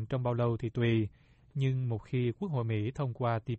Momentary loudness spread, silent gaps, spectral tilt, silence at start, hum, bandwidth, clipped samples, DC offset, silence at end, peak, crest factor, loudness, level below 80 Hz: 5 LU; none; -9 dB/octave; 0 s; none; 6.6 kHz; under 0.1%; under 0.1%; 0 s; -18 dBFS; 14 dB; -33 LUFS; -60 dBFS